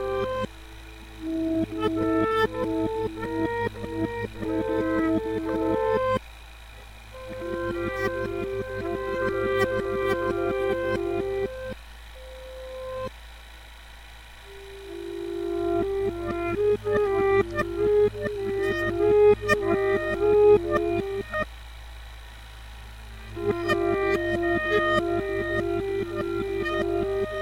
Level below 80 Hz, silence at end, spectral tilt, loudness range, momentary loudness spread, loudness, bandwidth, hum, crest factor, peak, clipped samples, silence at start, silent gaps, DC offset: -44 dBFS; 0 s; -6.5 dB/octave; 10 LU; 21 LU; -26 LUFS; 16 kHz; none; 18 dB; -8 dBFS; under 0.1%; 0 s; none; under 0.1%